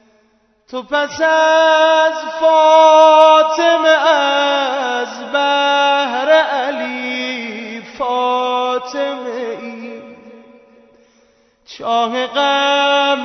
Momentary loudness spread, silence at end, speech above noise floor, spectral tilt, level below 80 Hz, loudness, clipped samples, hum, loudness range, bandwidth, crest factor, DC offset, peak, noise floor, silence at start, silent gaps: 17 LU; 0 s; 47 dB; -1.5 dB/octave; -64 dBFS; -13 LUFS; under 0.1%; none; 13 LU; 6.4 kHz; 14 dB; under 0.1%; 0 dBFS; -57 dBFS; 0.75 s; none